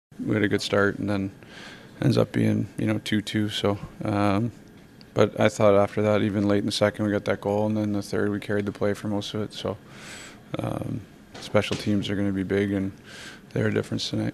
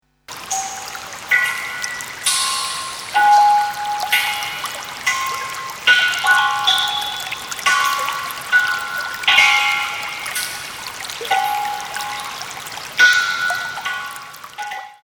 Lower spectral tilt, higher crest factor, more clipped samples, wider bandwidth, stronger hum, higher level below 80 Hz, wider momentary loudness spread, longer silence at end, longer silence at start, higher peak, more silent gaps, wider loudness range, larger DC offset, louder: first, -6 dB/octave vs 1.5 dB/octave; about the same, 22 dB vs 20 dB; neither; second, 14 kHz vs over 20 kHz; neither; about the same, -56 dBFS vs -58 dBFS; about the same, 15 LU vs 16 LU; about the same, 0 s vs 0.1 s; about the same, 0.2 s vs 0.3 s; second, -4 dBFS vs 0 dBFS; neither; first, 6 LU vs 3 LU; neither; second, -25 LUFS vs -17 LUFS